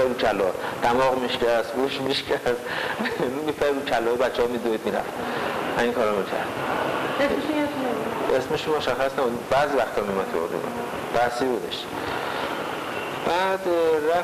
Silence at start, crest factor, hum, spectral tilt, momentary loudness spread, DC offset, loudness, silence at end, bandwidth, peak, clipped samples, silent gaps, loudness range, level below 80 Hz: 0 s; 12 dB; none; -4.5 dB/octave; 6 LU; under 0.1%; -24 LUFS; 0 s; 15.5 kHz; -12 dBFS; under 0.1%; none; 2 LU; -54 dBFS